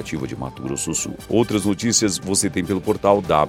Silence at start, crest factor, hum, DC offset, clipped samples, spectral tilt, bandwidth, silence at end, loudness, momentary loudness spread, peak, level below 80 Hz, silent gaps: 0 s; 20 dB; none; under 0.1%; under 0.1%; -4 dB/octave; 16.5 kHz; 0 s; -21 LUFS; 10 LU; 0 dBFS; -46 dBFS; none